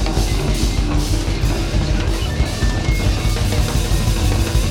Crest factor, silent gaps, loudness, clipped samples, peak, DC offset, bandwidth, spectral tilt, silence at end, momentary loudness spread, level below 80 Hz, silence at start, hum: 12 dB; none; -19 LUFS; under 0.1%; -4 dBFS; under 0.1%; 16.5 kHz; -5 dB/octave; 0 s; 2 LU; -20 dBFS; 0 s; none